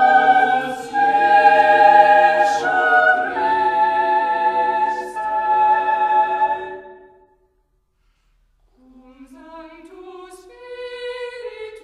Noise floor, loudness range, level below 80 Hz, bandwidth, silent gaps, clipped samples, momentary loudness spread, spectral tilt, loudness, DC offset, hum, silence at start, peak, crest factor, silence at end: -64 dBFS; 21 LU; -60 dBFS; 10.5 kHz; none; under 0.1%; 19 LU; -3.5 dB/octave; -15 LUFS; under 0.1%; none; 0 s; 0 dBFS; 18 dB; 0.05 s